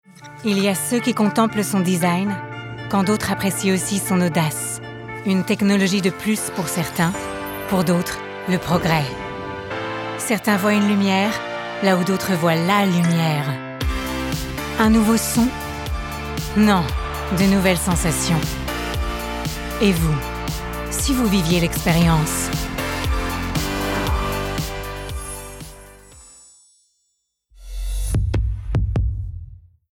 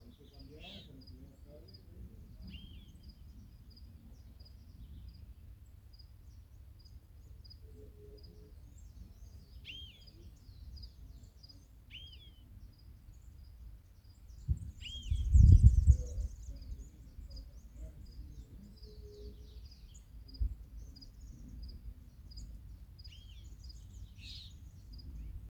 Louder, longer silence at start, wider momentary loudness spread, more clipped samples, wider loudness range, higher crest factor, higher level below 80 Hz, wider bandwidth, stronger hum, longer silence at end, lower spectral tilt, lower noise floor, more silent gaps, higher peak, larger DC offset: first, -20 LUFS vs -32 LUFS; second, 0.2 s vs 0.4 s; second, 11 LU vs 17 LU; neither; second, 7 LU vs 25 LU; second, 18 dB vs 28 dB; first, -32 dBFS vs -40 dBFS; first, 17.5 kHz vs 8.4 kHz; neither; first, 0.35 s vs 0 s; second, -5 dB/octave vs -7 dB/octave; first, -71 dBFS vs -57 dBFS; neither; first, -4 dBFS vs -8 dBFS; neither